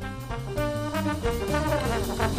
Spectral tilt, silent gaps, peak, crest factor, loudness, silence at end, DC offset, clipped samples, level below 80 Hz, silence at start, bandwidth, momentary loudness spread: -5.5 dB/octave; none; -10 dBFS; 16 dB; -28 LUFS; 0 s; under 0.1%; under 0.1%; -36 dBFS; 0 s; 15.5 kHz; 7 LU